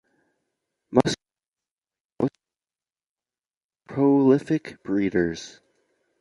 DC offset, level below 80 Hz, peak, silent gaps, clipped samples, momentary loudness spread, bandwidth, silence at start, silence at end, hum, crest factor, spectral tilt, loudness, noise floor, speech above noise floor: under 0.1%; -58 dBFS; -2 dBFS; 1.78-1.82 s, 2.00-2.10 s, 3.06-3.15 s, 3.64-3.70 s; under 0.1%; 15 LU; 11.5 kHz; 0.9 s; 0.75 s; none; 24 dB; -6.5 dB/octave; -23 LUFS; under -90 dBFS; over 66 dB